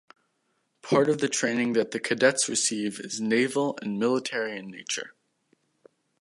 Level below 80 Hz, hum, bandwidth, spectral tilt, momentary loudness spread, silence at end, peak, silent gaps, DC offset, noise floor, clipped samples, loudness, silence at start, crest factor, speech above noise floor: -76 dBFS; none; 11.5 kHz; -3 dB/octave; 10 LU; 1.1 s; -6 dBFS; none; under 0.1%; -74 dBFS; under 0.1%; -26 LUFS; 0.85 s; 22 dB; 48 dB